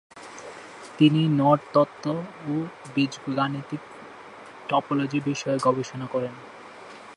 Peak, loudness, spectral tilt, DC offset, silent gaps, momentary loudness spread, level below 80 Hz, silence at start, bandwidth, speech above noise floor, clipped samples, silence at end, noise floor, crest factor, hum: -6 dBFS; -25 LUFS; -6.5 dB/octave; under 0.1%; none; 23 LU; -70 dBFS; 0.15 s; 11 kHz; 20 dB; under 0.1%; 0 s; -44 dBFS; 20 dB; none